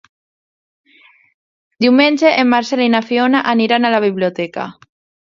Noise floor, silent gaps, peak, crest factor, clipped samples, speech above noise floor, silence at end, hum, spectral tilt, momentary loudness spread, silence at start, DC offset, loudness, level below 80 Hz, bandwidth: -50 dBFS; none; 0 dBFS; 16 dB; under 0.1%; 36 dB; 0.6 s; none; -5 dB/octave; 11 LU; 1.8 s; under 0.1%; -14 LUFS; -64 dBFS; 7.4 kHz